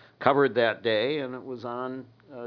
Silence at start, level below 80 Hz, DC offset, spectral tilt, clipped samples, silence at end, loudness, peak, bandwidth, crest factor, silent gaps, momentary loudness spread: 0.2 s; -76 dBFS; under 0.1%; -7.5 dB/octave; under 0.1%; 0 s; -27 LUFS; -4 dBFS; 5.4 kHz; 24 dB; none; 14 LU